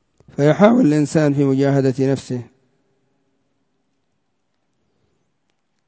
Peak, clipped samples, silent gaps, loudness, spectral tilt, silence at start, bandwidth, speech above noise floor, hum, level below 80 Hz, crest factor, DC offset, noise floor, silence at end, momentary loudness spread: 0 dBFS; under 0.1%; none; -16 LUFS; -7.5 dB/octave; 0.4 s; 8 kHz; 56 dB; none; -60 dBFS; 20 dB; under 0.1%; -72 dBFS; 3.45 s; 15 LU